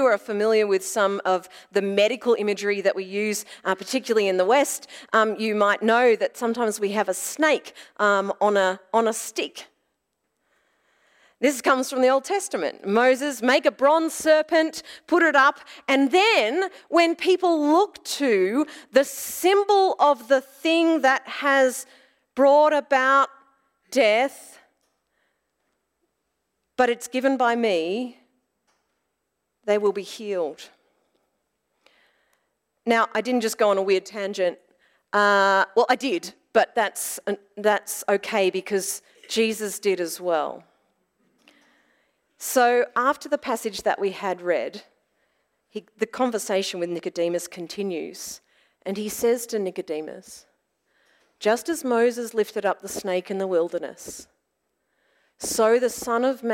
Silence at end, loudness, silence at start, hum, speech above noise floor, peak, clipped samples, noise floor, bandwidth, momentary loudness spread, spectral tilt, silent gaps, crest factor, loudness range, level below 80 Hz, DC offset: 0 s; -22 LUFS; 0 s; none; 55 dB; -4 dBFS; under 0.1%; -78 dBFS; 16.5 kHz; 12 LU; -3 dB/octave; none; 18 dB; 8 LU; -70 dBFS; under 0.1%